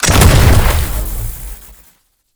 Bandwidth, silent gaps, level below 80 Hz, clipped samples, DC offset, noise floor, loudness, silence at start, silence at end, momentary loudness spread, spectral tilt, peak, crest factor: over 20 kHz; none; -16 dBFS; 0.4%; under 0.1%; -52 dBFS; -12 LUFS; 0 s; 0.8 s; 21 LU; -4.5 dB/octave; 0 dBFS; 12 dB